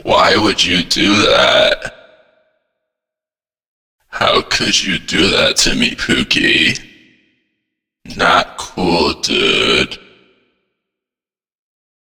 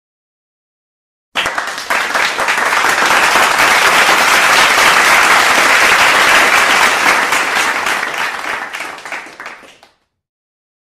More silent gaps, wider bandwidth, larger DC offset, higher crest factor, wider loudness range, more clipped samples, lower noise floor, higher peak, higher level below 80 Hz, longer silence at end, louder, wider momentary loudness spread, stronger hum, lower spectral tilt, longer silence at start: first, 3.68-3.98 s vs none; first, over 20 kHz vs 16.5 kHz; neither; about the same, 16 dB vs 12 dB; second, 4 LU vs 8 LU; neither; first, under -90 dBFS vs -50 dBFS; about the same, 0 dBFS vs 0 dBFS; first, -38 dBFS vs -48 dBFS; first, 2.05 s vs 1.15 s; second, -12 LUFS vs -9 LUFS; second, 11 LU vs 14 LU; neither; first, -2.5 dB/octave vs 0 dB/octave; second, 0.05 s vs 1.35 s